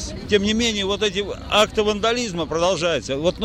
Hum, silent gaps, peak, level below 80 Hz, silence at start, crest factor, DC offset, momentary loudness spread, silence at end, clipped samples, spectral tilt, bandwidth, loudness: none; none; -6 dBFS; -40 dBFS; 0 s; 16 dB; under 0.1%; 5 LU; 0 s; under 0.1%; -3.5 dB/octave; 15.5 kHz; -20 LUFS